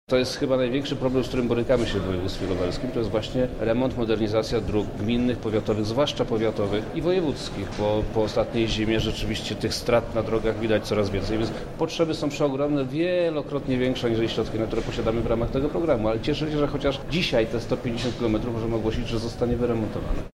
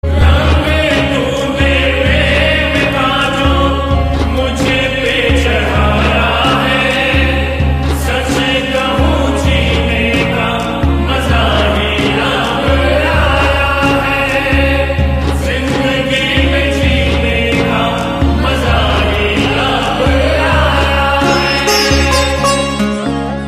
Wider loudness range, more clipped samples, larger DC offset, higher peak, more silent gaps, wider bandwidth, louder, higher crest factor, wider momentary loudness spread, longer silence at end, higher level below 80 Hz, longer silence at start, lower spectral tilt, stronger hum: about the same, 1 LU vs 1 LU; neither; neither; second, -8 dBFS vs 0 dBFS; neither; about the same, 15 kHz vs 14.5 kHz; second, -25 LUFS vs -12 LUFS; about the same, 16 dB vs 12 dB; about the same, 4 LU vs 4 LU; about the same, 0.05 s vs 0 s; second, -38 dBFS vs -18 dBFS; about the same, 0.1 s vs 0.05 s; about the same, -6 dB/octave vs -5 dB/octave; neither